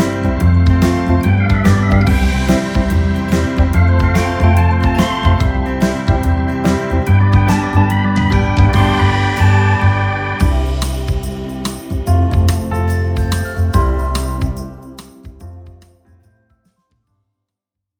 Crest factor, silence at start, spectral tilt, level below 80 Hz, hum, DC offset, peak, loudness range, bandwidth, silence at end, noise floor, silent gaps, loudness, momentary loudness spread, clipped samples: 14 dB; 0 s; -6.5 dB/octave; -20 dBFS; none; under 0.1%; 0 dBFS; 7 LU; 16.5 kHz; 2.3 s; -81 dBFS; none; -14 LUFS; 8 LU; under 0.1%